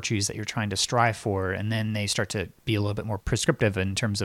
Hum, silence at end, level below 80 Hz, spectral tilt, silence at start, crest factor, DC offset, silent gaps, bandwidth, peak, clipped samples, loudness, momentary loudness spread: none; 0 s; -48 dBFS; -4.5 dB/octave; 0 s; 20 dB; under 0.1%; none; 15 kHz; -6 dBFS; under 0.1%; -26 LUFS; 6 LU